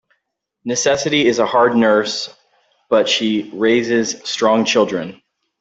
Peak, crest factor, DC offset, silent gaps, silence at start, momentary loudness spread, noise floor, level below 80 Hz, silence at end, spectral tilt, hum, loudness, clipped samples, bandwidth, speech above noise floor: -2 dBFS; 14 dB; under 0.1%; none; 0.65 s; 10 LU; -73 dBFS; -60 dBFS; 0.45 s; -3.5 dB/octave; none; -16 LUFS; under 0.1%; 8 kHz; 58 dB